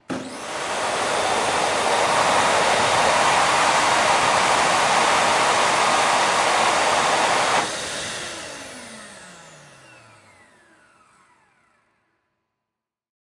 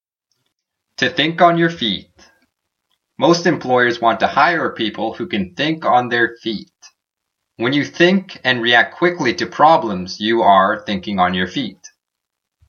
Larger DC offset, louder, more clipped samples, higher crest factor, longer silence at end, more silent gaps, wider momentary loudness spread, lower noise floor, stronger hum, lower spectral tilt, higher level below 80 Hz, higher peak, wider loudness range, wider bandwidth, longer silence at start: neither; second, -19 LUFS vs -16 LUFS; neither; about the same, 16 dB vs 18 dB; first, 3.8 s vs 0.95 s; neither; first, 14 LU vs 10 LU; first, -85 dBFS vs -80 dBFS; neither; second, -1.5 dB/octave vs -5 dB/octave; about the same, -56 dBFS vs -58 dBFS; second, -6 dBFS vs 0 dBFS; first, 11 LU vs 4 LU; first, 11.5 kHz vs 7 kHz; second, 0.1 s vs 1 s